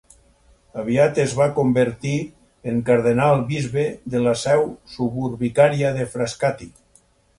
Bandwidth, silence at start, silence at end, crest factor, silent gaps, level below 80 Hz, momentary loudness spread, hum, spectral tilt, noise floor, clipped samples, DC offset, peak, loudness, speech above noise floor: 11.5 kHz; 0.75 s; 0.7 s; 18 dB; none; -52 dBFS; 10 LU; none; -6.5 dB/octave; -57 dBFS; under 0.1%; under 0.1%; -2 dBFS; -20 LUFS; 38 dB